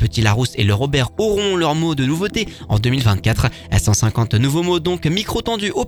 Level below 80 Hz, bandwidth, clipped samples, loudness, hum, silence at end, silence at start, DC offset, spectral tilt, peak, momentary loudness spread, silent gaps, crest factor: -32 dBFS; 19 kHz; under 0.1%; -18 LUFS; none; 0 s; 0 s; under 0.1%; -5 dB/octave; 0 dBFS; 4 LU; none; 16 dB